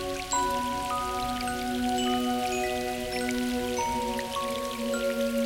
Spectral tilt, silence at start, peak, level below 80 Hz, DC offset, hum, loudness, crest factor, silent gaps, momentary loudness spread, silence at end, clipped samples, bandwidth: -3 dB/octave; 0 s; -16 dBFS; -48 dBFS; under 0.1%; none; -29 LUFS; 14 dB; none; 4 LU; 0 s; under 0.1%; 18 kHz